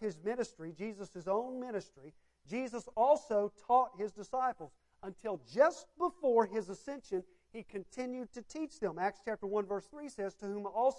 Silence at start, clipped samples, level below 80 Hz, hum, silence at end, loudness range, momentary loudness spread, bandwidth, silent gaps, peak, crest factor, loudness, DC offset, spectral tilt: 0 s; under 0.1%; -72 dBFS; none; 0 s; 6 LU; 15 LU; 11 kHz; none; -16 dBFS; 20 dB; -36 LUFS; under 0.1%; -5.5 dB/octave